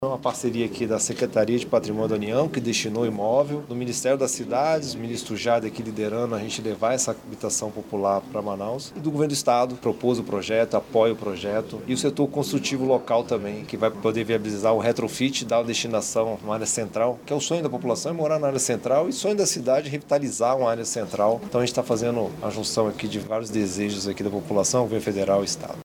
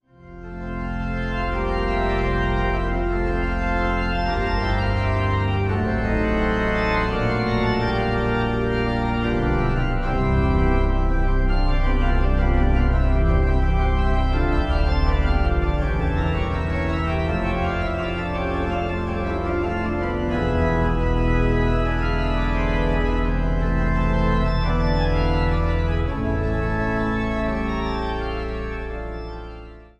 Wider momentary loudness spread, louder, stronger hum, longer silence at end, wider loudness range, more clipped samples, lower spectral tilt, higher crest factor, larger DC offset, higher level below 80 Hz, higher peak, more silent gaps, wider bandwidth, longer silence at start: about the same, 6 LU vs 5 LU; about the same, -24 LUFS vs -23 LUFS; neither; second, 0 s vs 0.2 s; about the same, 2 LU vs 3 LU; neither; second, -4 dB/octave vs -8 dB/octave; about the same, 18 dB vs 14 dB; neither; second, -60 dBFS vs -24 dBFS; about the same, -6 dBFS vs -8 dBFS; neither; first, 18.5 kHz vs 7 kHz; second, 0 s vs 0.25 s